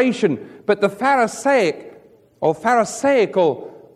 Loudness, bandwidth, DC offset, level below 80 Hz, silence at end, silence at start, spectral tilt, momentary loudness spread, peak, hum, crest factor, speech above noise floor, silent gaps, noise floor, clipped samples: -18 LUFS; 13.5 kHz; under 0.1%; -66 dBFS; 0.2 s; 0 s; -5 dB/octave; 6 LU; -4 dBFS; none; 16 dB; 30 dB; none; -48 dBFS; under 0.1%